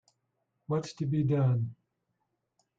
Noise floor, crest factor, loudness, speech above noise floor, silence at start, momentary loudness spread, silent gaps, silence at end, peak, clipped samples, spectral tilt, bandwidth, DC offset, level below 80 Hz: -81 dBFS; 14 dB; -31 LUFS; 52 dB; 0.7 s; 7 LU; none; 1.05 s; -18 dBFS; under 0.1%; -8.5 dB/octave; 7.8 kHz; under 0.1%; -68 dBFS